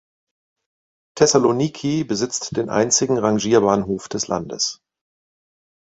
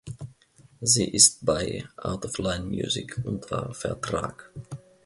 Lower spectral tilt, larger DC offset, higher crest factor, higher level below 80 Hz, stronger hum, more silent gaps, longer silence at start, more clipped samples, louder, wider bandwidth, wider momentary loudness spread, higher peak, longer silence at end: about the same, -4 dB/octave vs -3 dB/octave; neither; second, 20 dB vs 26 dB; about the same, -54 dBFS vs -50 dBFS; neither; neither; first, 1.15 s vs 0.05 s; neither; first, -19 LUFS vs -25 LUFS; second, 8.4 kHz vs 12 kHz; second, 8 LU vs 24 LU; about the same, -2 dBFS vs -2 dBFS; first, 1.1 s vs 0.25 s